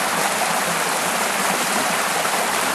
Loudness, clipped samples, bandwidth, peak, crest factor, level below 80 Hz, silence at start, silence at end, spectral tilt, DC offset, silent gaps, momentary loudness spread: -19 LUFS; under 0.1%; 13 kHz; -4 dBFS; 16 dB; -62 dBFS; 0 s; 0 s; -1.5 dB/octave; under 0.1%; none; 1 LU